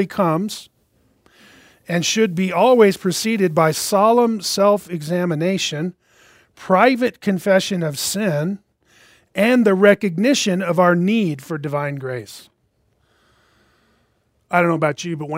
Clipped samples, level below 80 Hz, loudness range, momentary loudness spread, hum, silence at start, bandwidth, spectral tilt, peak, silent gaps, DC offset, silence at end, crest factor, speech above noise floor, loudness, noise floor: under 0.1%; -64 dBFS; 8 LU; 12 LU; none; 0 s; 16 kHz; -5 dB/octave; 0 dBFS; none; under 0.1%; 0 s; 18 dB; 47 dB; -18 LUFS; -64 dBFS